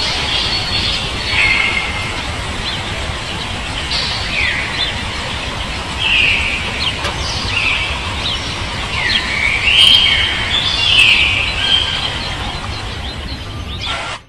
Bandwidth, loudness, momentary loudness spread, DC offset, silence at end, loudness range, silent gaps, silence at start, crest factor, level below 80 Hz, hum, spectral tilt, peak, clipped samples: 12 kHz; -14 LUFS; 13 LU; 0.8%; 0.05 s; 8 LU; none; 0 s; 16 dB; -28 dBFS; none; -2.5 dB/octave; 0 dBFS; under 0.1%